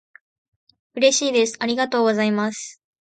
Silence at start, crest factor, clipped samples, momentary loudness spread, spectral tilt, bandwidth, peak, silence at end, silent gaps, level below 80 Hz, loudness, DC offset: 0.95 s; 18 dB; under 0.1%; 16 LU; -3 dB/octave; 9.4 kHz; -4 dBFS; 0.35 s; none; -72 dBFS; -20 LUFS; under 0.1%